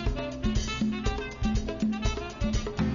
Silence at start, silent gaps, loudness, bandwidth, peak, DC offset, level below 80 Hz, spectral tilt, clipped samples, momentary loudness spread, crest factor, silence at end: 0 s; none; -31 LUFS; 7.4 kHz; -14 dBFS; 0.1%; -34 dBFS; -5.5 dB/octave; under 0.1%; 3 LU; 14 dB; 0 s